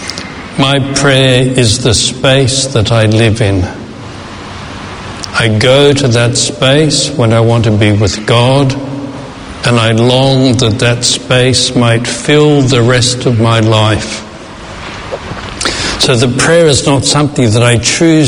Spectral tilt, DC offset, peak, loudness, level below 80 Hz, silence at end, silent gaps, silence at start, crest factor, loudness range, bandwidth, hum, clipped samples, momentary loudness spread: -4.5 dB/octave; under 0.1%; 0 dBFS; -9 LUFS; -34 dBFS; 0 s; none; 0 s; 10 dB; 3 LU; 11 kHz; none; 0.5%; 16 LU